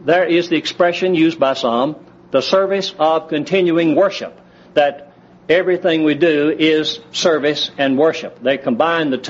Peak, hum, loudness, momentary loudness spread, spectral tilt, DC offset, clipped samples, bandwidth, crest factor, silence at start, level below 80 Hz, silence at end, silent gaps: -2 dBFS; none; -16 LUFS; 5 LU; -3 dB/octave; under 0.1%; under 0.1%; 8 kHz; 14 dB; 0 s; -62 dBFS; 0 s; none